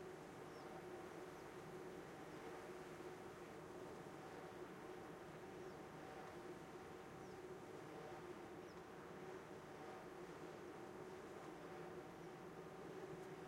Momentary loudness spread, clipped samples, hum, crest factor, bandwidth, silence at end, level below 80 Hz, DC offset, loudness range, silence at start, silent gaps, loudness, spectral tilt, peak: 2 LU; under 0.1%; none; 12 dB; 16 kHz; 0 s; -80 dBFS; under 0.1%; 1 LU; 0 s; none; -56 LUFS; -5.5 dB/octave; -42 dBFS